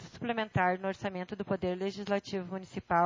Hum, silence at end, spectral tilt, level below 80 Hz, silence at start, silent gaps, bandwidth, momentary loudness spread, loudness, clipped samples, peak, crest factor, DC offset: none; 0 s; -6.5 dB/octave; -60 dBFS; 0 s; none; 7.6 kHz; 9 LU; -34 LUFS; under 0.1%; -14 dBFS; 18 dB; under 0.1%